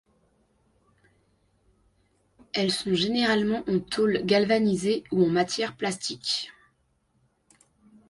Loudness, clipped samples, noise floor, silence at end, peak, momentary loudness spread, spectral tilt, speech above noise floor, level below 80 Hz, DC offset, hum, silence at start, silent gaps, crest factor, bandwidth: -25 LUFS; under 0.1%; -70 dBFS; 1.6 s; -10 dBFS; 7 LU; -4.5 dB/octave; 45 dB; -62 dBFS; under 0.1%; none; 2.55 s; none; 18 dB; 11.5 kHz